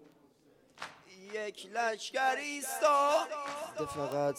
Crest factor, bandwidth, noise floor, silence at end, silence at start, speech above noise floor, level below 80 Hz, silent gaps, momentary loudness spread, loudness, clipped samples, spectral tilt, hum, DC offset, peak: 20 dB; 16.5 kHz; -65 dBFS; 0 s; 0.75 s; 33 dB; -74 dBFS; none; 20 LU; -33 LUFS; under 0.1%; -3 dB/octave; none; under 0.1%; -14 dBFS